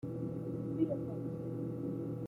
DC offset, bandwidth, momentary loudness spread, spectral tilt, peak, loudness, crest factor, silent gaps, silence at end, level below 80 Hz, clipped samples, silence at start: under 0.1%; 11.5 kHz; 5 LU; -11 dB/octave; -20 dBFS; -39 LUFS; 18 dB; none; 0 s; -66 dBFS; under 0.1%; 0.05 s